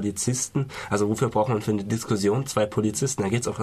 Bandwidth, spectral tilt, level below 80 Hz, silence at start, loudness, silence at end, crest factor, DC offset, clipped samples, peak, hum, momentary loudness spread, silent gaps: 14 kHz; -5 dB/octave; -54 dBFS; 0 s; -25 LUFS; 0 s; 16 dB; under 0.1%; under 0.1%; -10 dBFS; none; 3 LU; none